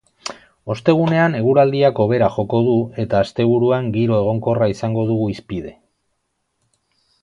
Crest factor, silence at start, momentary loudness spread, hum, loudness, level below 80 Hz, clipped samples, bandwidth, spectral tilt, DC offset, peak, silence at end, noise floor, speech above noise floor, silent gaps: 18 dB; 0.25 s; 14 LU; none; -17 LUFS; -50 dBFS; under 0.1%; 10.5 kHz; -7.5 dB/octave; under 0.1%; 0 dBFS; 1.5 s; -71 dBFS; 55 dB; none